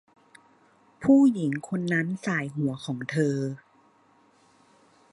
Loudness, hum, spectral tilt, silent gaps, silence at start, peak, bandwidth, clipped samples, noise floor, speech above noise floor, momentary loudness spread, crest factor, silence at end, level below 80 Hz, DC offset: -26 LUFS; none; -7 dB/octave; none; 1 s; -8 dBFS; 11 kHz; under 0.1%; -61 dBFS; 37 dB; 12 LU; 20 dB; 1.55 s; -68 dBFS; under 0.1%